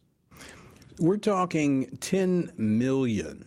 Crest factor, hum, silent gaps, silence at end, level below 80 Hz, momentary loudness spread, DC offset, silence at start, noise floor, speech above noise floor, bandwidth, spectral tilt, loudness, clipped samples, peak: 16 dB; none; none; 0.05 s; -58 dBFS; 11 LU; under 0.1%; 0.4 s; -51 dBFS; 25 dB; 16 kHz; -6.5 dB/octave; -26 LUFS; under 0.1%; -12 dBFS